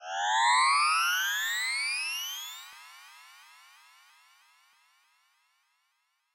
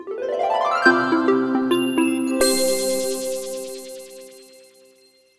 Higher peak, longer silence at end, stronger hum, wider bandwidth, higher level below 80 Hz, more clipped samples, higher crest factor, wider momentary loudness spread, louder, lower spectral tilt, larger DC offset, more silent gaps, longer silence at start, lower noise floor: second, -16 dBFS vs 0 dBFS; first, 3.15 s vs 0.95 s; neither; first, 16 kHz vs 12 kHz; second, under -90 dBFS vs -60 dBFS; neither; about the same, 16 dB vs 20 dB; first, 24 LU vs 18 LU; second, -26 LUFS vs -20 LUFS; second, 7.5 dB/octave vs -2.5 dB/octave; neither; neither; about the same, 0 s vs 0 s; first, -76 dBFS vs -55 dBFS